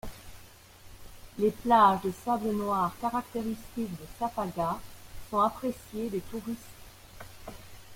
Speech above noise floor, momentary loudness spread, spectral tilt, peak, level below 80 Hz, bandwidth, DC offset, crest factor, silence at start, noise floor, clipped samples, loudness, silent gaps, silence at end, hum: 23 dB; 25 LU; -6 dB/octave; -10 dBFS; -54 dBFS; 16.5 kHz; under 0.1%; 22 dB; 0.05 s; -52 dBFS; under 0.1%; -30 LUFS; none; 0 s; none